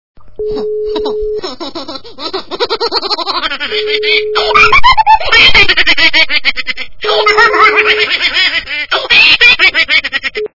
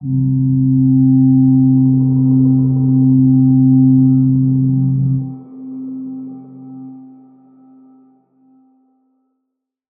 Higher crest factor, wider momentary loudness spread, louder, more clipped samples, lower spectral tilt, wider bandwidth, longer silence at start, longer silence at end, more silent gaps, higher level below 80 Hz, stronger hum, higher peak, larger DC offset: about the same, 10 dB vs 10 dB; second, 16 LU vs 20 LU; first, -8 LUFS vs -12 LUFS; first, 2% vs under 0.1%; second, -2 dB/octave vs -18 dB/octave; first, 6 kHz vs 1.3 kHz; first, 0.2 s vs 0 s; second, 0.1 s vs 2.9 s; neither; first, -32 dBFS vs -48 dBFS; neither; about the same, 0 dBFS vs -2 dBFS; neither